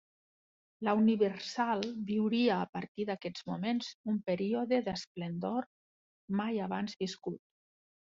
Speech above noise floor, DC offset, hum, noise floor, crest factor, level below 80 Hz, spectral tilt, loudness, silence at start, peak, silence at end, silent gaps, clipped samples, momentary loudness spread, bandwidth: over 57 dB; under 0.1%; none; under -90 dBFS; 18 dB; -74 dBFS; -5 dB/octave; -34 LUFS; 0.8 s; -16 dBFS; 0.8 s; 2.69-2.73 s, 2.88-2.95 s, 3.94-4.04 s, 5.07-5.15 s, 5.66-6.28 s; under 0.1%; 10 LU; 7.6 kHz